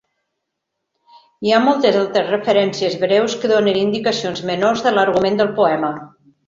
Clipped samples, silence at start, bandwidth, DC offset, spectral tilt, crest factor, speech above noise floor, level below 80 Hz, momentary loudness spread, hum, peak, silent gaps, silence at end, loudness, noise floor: under 0.1%; 1.4 s; 7.6 kHz; under 0.1%; -5 dB/octave; 16 dB; 61 dB; -58 dBFS; 7 LU; none; -2 dBFS; none; 0.4 s; -17 LUFS; -77 dBFS